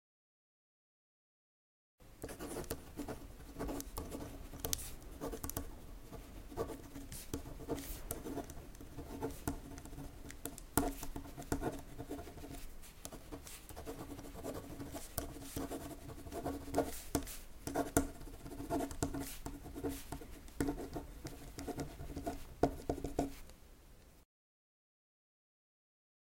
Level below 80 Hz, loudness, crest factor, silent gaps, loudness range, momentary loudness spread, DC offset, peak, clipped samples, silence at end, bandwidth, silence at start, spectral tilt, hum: -52 dBFS; -44 LUFS; 34 dB; none; 7 LU; 13 LU; under 0.1%; -10 dBFS; under 0.1%; 2 s; 16.5 kHz; 2 s; -5 dB/octave; none